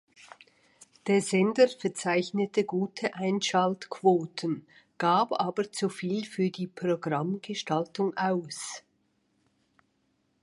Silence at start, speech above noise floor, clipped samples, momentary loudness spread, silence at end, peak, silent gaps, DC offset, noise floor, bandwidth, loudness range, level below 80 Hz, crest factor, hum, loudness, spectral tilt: 1.05 s; 45 dB; under 0.1%; 9 LU; 1.65 s; -10 dBFS; none; under 0.1%; -73 dBFS; 11.5 kHz; 5 LU; -78 dBFS; 20 dB; none; -29 LUFS; -5 dB/octave